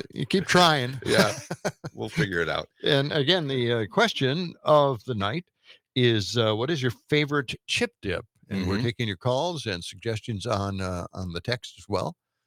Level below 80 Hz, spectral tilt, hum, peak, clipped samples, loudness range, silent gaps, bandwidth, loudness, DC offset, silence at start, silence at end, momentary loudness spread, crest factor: -60 dBFS; -5 dB/octave; none; -6 dBFS; under 0.1%; 5 LU; none; 18 kHz; -26 LUFS; under 0.1%; 0.15 s; 0.35 s; 11 LU; 20 dB